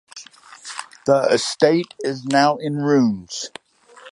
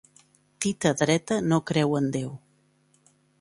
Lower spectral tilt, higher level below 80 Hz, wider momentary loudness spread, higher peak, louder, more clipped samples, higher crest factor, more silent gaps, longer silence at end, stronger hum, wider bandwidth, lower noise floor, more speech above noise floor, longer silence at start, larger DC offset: about the same, -4.5 dB/octave vs -5 dB/octave; about the same, -64 dBFS vs -62 dBFS; first, 16 LU vs 9 LU; first, 0 dBFS vs -6 dBFS; first, -19 LUFS vs -25 LUFS; neither; about the same, 20 dB vs 20 dB; neither; second, 0.05 s vs 1.05 s; neither; about the same, 11.5 kHz vs 11.5 kHz; second, -46 dBFS vs -65 dBFS; second, 28 dB vs 40 dB; second, 0.15 s vs 0.6 s; neither